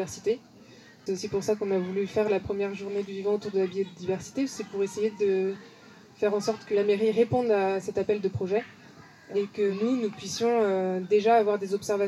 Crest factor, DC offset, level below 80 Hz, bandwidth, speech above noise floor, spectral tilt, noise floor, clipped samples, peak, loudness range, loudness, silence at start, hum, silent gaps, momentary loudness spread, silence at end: 16 dB; under 0.1%; -64 dBFS; 12.5 kHz; 25 dB; -5.5 dB/octave; -52 dBFS; under 0.1%; -10 dBFS; 3 LU; -28 LUFS; 0 s; none; none; 8 LU; 0 s